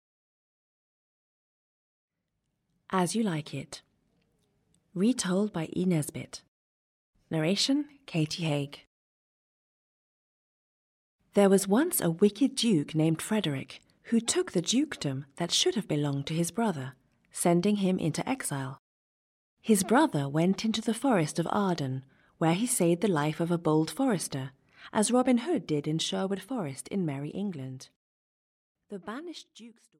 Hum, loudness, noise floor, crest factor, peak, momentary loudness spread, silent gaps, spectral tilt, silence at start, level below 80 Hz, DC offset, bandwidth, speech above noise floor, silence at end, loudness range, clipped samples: none; -28 LUFS; -82 dBFS; 20 dB; -10 dBFS; 15 LU; 6.48-7.13 s, 8.87-11.19 s, 18.79-19.57 s, 27.96-28.75 s; -5 dB/octave; 2.9 s; -70 dBFS; under 0.1%; 16 kHz; 54 dB; 0.3 s; 8 LU; under 0.1%